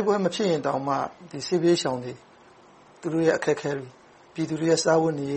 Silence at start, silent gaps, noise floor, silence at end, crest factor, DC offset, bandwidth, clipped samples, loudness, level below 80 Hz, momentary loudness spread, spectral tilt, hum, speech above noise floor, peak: 0 s; none; -53 dBFS; 0 s; 16 dB; under 0.1%; 8.8 kHz; under 0.1%; -25 LUFS; -66 dBFS; 14 LU; -5 dB/octave; none; 28 dB; -8 dBFS